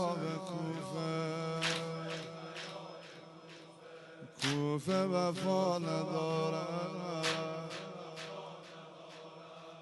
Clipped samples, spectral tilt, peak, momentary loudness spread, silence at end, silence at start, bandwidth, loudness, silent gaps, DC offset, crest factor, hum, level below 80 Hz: under 0.1%; -5 dB/octave; -20 dBFS; 19 LU; 0 s; 0 s; 11.5 kHz; -37 LUFS; none; under 0.1%; 18 dB; none; -80 dBFS